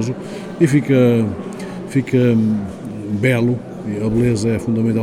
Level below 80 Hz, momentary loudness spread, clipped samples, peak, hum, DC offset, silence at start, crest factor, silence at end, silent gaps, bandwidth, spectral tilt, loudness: -44 dBFS; 14 LU; under 0.1%; -2 dBFS; none; under 0.1%; 0 s; 16 dB; 0 s; none; 12.5 kHz; -7.5 dB/octave; -17 LUFS